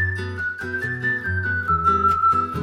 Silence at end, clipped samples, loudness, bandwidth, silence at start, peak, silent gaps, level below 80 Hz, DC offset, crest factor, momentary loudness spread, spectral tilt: 0 s; under 0.1%; -21 LUFS; 14 kHz; 0 s; -8 dBFS; none; -46 dBFS; under 0.1%; 14 dB; 9 LU; -6.5 dB/octave